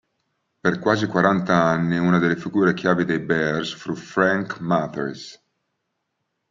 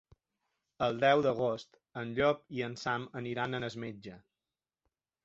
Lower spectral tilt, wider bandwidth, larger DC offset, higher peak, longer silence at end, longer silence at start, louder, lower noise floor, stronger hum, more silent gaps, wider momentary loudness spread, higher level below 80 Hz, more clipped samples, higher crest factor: about the same, -6.5 dB/octave vs -6 dB/octave; about the same, 7.6 kHz vs 7.8 kHz; neither; first, -2 dBFS vs -12 dBFS; about the same, 1.15 s vs 1.05 s; second, 0.65 s vs 0.8 s; first, -21 LUFS vs -33 LUFS; second, -76 dBFS vs under -90 dBFS; neither; neither; second, 10 LU vs 16 LU; first, -60 dBFS vs -66 dBFS; neither; about the same, 20 dB vs 22 dB